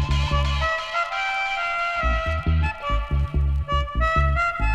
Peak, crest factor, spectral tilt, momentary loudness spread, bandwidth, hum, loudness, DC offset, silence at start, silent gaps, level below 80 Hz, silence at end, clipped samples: -8 dBFS; 14 dB; -5.5 dB/octave; 4 LU; 8.4 kHz; none; -23 LUFS; under 0.1%; 0 s; none; -26 dBFS; 0 s; under 0.1%